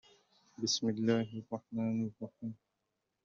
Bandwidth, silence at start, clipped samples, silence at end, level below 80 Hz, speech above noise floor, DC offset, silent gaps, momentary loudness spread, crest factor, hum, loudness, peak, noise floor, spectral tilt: 7.4 kHz; 0.6 s; under 0.1%; 0.7 s; -78 dBFS; 50 dB; under 0.1%; none; 14 LU; 20 dB; none; -36 LUFS; -18 dBFS; -85 dBFS; -5 dB/octave